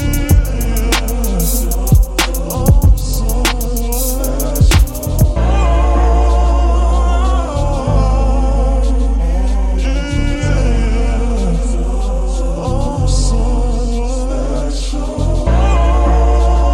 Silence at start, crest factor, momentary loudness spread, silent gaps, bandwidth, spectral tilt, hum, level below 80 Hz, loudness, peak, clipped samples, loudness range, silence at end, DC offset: 0 s; 12 dB; 6 LU; none; 17 kHz; -5.5 dB/octave; none; -14 dBFS; -15 LUFS; 0 dBFS; under 0.1%; 4 LU; 0 s; under 0.1%